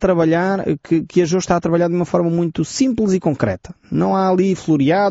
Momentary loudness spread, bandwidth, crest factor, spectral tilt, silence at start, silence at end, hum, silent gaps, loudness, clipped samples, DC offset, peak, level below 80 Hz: 5 LU; 8 kHz; 14 dB; -6.5 dB/octave; 0 s; 0 s; none; none; -17 LUFS; under 0.1%; under 0.1%; -2 dBFS; -46 dBFS